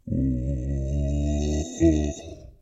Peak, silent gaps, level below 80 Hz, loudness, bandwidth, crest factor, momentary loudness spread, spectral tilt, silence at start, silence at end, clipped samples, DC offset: -8 dBFS; none; -30 dBFS; -26 LUFS; 8 kHz; 16 dB; 9 LU; -7.5 dB/octave; 0.05 s; 0.1 s; under 0.1%; under 0.1%